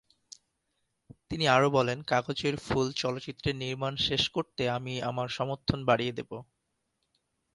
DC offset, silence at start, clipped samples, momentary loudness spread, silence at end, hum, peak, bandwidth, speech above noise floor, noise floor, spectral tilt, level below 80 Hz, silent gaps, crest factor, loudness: under 0.1%; 1.3 s; under 0.1%; 9 LU; 1.1 s; none; -10 dBFS; 11.5 kHz; 50 dB; -79 dBFS; -5 dB/octave; -56 dBFS; none; 22 dB; -29 LUFS